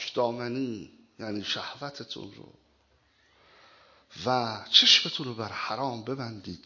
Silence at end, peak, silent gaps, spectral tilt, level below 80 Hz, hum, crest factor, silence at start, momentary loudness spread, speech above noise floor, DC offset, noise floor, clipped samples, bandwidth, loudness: 0.1 s; -4 dBFS; none; -3 dB/octave; -66 dBFS; none; 26 dB; 0 s; 21 LU; 38 dB; under 0.1%; -67 dBFS; under 0.1%; 7.6 kHz; -26 LUFS